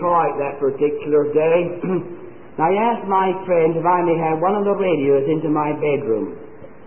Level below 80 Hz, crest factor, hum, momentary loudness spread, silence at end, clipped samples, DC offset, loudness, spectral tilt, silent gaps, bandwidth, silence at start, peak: -58 dBFS; 12 dB; none; 7 LU; 0.2 s; under 0.1%; 1%; -19 LUFS; -12 dB/octave; none; 3.3 kHz; 0 s; -6 dBFS